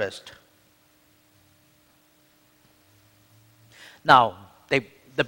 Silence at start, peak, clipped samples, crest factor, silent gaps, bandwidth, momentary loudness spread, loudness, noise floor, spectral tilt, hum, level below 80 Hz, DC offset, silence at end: 0 s; 0 dBFS; under 0.1%; 28 dB; none; 16.5 kHz; 22 LU; -21 LUFS; -61 dBFS; -4.5 dB/octave; none; -66 dBFS; under 0.1%; 0 s